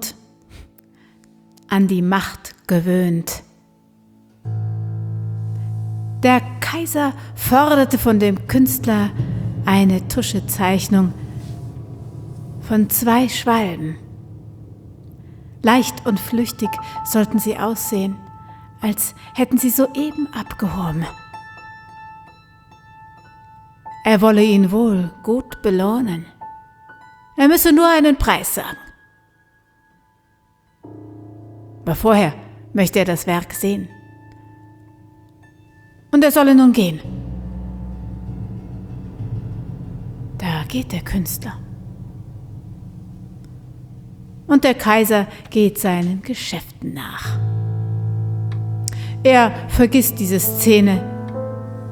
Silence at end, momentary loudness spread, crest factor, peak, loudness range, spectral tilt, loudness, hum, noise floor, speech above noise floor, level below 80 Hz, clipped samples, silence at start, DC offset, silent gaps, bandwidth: 0 s; 23 LU; 18 dB; 0 dBFS; 11 LU; -5.5 dB/octave; -17 LUFS; none; -59 dBFS; 43 dB; -40 dBFS; under 0.1%; 0 s; under 0.1%; none; over 20 kHz